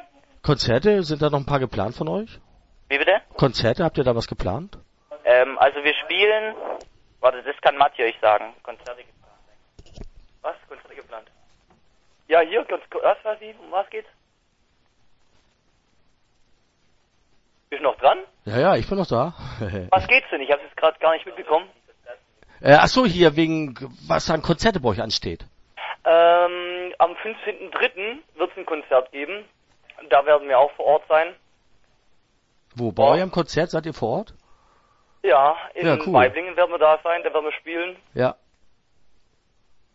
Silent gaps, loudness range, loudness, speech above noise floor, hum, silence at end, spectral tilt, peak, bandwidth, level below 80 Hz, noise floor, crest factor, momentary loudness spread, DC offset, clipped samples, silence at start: none; 8 LU; -21 LUFS; 44 dB; none; 1.6 s; -5.5 dB/octave; 0 dBFS; 8 kHz; -46 dBFS; -65 dBFS; 22 dB; 16 LU; under 0.1%; under 0.1%; 0.45 s